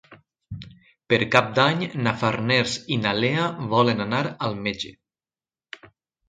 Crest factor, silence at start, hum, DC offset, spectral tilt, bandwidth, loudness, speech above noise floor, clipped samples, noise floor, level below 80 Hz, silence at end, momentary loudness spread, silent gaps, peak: 24 dB; 0.1 s; none; under 0.1%; -5 dB/octave; 9.8 kHz; -22 LUFS; over 68 dB; under 0.1%; under -90 dBFS; -58 dBFS; 0.45 s; 21 LU; none; 0 dBFS